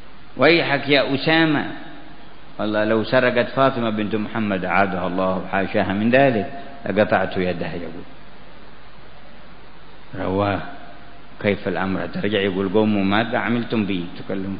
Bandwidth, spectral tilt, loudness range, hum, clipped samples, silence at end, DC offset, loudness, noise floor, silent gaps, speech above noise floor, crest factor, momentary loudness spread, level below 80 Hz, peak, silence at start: 5.2 kHz; -11 dB/octave; 10 LU; none; under 0.1%; 0 s; 3%; -20 LUFS; -45 dBFS; none; 25 dB; 20 dB; 15 LU; -52 dBFS; -2 dBFS; 0.05 s